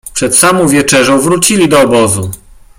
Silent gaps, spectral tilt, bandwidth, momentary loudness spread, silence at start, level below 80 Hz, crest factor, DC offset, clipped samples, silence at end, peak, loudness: none; -3.5 dB/octave; over 20 kHz; 5 LU; 0.05 s; -40 dBFS; 10 dB; under 0.1%; 0.2%; 0.45 s; 0 dBFS; -8 LUFS